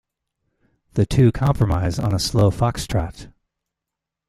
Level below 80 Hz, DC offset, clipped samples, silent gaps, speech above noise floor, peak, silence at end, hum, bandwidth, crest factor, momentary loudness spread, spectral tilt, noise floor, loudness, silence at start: -36 dBFS; under 0.1%; under 0.1%; none; 66 dB; -4 dBFS; 1 s; none; 14 kHz; 18 dB; 8 LU; -6.5 dB/octave; -85 dBFS; -20 LUFS; 0.95 s